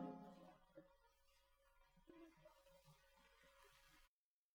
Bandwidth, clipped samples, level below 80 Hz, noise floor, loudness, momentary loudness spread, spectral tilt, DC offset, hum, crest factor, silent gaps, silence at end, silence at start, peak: 19.5 kHz; under 0.1%; -82 dBFS; -86 dBFS; -64 LUFS; 11 LU; -6 dB/octave; under 0.1%; none; 24 dB; none; 0.45 s; 0 s; -40 dBFS